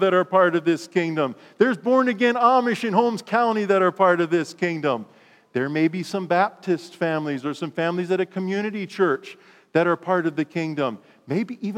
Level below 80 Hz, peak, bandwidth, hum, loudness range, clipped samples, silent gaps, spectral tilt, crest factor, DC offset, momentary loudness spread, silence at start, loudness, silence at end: -82 dBFS; -4 dBFS; 13 kHz; none; 5 LU; under 0.1%; none; -6.5 dB/octave; 18 dB; under 0.1%; 10 LU; 0 s; -22 LUFS; 0 s